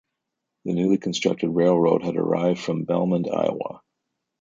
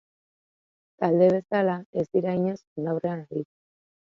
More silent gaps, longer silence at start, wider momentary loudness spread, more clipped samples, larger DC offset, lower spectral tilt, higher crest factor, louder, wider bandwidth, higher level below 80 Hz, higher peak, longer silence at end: second, none vs 1.86-1.93 s, 2.67-2.76 s; second, 0.65 s vs 1 s; second, 8 LU vs 13 LU; neither; neither; second, -6.5 dB/octave vs -9 dB/octave; about the same, 18 dB vs 20 dB; first, -23 LUFS vs -26 LUFS; first, 7.8 kHz vs 7 kHz; first, -62 dBFS vs -70 dBFS; about the same, -6 dBFS vs -8 dBFS; about the same, 0.65 s vs 0.7 s